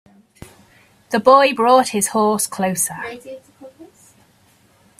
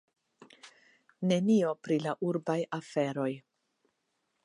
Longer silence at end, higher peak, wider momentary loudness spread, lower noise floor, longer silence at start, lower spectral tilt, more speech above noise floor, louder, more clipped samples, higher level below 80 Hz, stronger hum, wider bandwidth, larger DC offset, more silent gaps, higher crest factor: about the same, 1.15 s vs 1.05 s; first, 0 dBFS vs -16 dBFS; first, 21 LU vs 9 LU; second, -55 dBFS vs -80 dBFS; first, 1.1 s vs 0.65 s; second, -3.5 dB/octave vs -7 dB/octave; second, 39 dB vs 50 dB; first, -16 LUFS vs -31 LUFS; neither; first, -60 dBFS vs -82 dBFS; neither; first, 16 kHz vs 11.5 kHz; neither; neither; about the same, 20 dB vs 18 dB